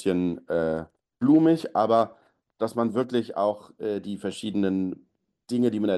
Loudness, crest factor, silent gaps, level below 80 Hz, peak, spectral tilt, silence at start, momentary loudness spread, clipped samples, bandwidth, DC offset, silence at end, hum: -26 LUFS; 16 dB; none; -62 dBFS; -10 dBFS; -7.5 dB/octave; 0 s; 12 LU; under 0.1%; 12 kHz; under 0.1%; 0 s; none